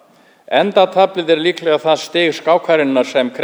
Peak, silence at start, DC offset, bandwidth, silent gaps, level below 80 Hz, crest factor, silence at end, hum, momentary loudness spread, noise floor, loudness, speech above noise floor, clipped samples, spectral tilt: 0 dBFS; 0.5 s; under 0.1%; over 20 kHz; none; -70 dBFS; 14 dB; 0 s; none; 3 LU; -45 dBFS; -14 LUFS; 31 dB; under 0.1%; -4.5 dB/octave